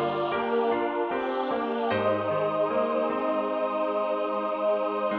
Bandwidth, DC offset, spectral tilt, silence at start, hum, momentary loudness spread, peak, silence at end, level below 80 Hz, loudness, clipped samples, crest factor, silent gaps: 5.4 kHz; under 0.1%; -8.5 dB/octave; 0 s; none; 3 LU; -14 dBFS; 0 s; -68 dBFS; -27 LUFS; under 0.1%; 14 dB; none